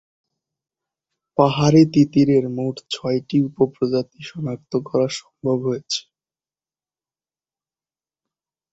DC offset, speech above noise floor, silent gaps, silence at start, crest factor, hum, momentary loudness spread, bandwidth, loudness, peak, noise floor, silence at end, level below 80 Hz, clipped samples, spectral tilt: under 0.1%; over 71 dB; none; 1.4 s; 20 dB; none; 12 LU; 8 kHz; -20 LUFS; -2 dBFS; under -90 dBFS; 2.7 s; -56 dBFS; under 0.1%; -6.5 dB/octave